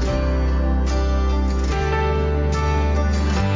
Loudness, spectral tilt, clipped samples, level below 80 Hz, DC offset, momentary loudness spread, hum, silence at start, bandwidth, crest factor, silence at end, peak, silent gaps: -21 LUFS; -6.5 dB/octave; under 0.1%; -20 dBFS; under 0.1%; 1 LU; none; 0 s; 7.6 kHz; 10 dB; 0 s; -10 dBFS; none